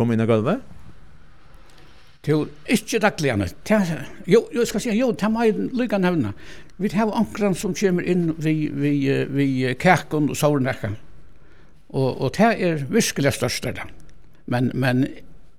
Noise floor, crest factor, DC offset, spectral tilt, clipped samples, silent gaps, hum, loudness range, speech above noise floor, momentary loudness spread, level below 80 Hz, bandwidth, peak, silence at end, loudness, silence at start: -50 dBFS; 20 dB; 1%; -6 dB/octave; under 0.1%; none; none; 3 LU; 29 dB; 9 LU; -50 dBFS; 17 kHz; -2 dBFS; 0.25 s; -22 LUFS; 0 s